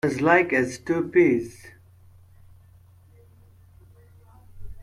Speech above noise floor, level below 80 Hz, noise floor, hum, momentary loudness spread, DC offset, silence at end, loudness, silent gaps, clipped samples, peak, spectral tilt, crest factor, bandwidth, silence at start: 31 dB; -52 dBFS; -53 dBFS; none; 8 LU; under 0.1%; 0 s; -21 LUFS; none; under 0.1%; -6 dBFS; -6.5 dB/octave; 20 dB; 12 kHz; 0.05 s